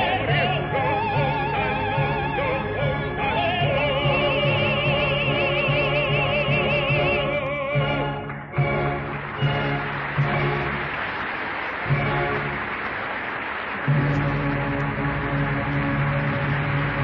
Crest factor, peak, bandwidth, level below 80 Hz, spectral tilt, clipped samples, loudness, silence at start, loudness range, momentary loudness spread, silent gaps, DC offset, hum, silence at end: 14 dB; -10 dBFS; 5.6 kHz; -40 dBFS; -8.5 dB/octave; under 0.1%; -23 LUFS; 0 s; 4 LU; 6 LU; none; under 0.1%; none; 0 s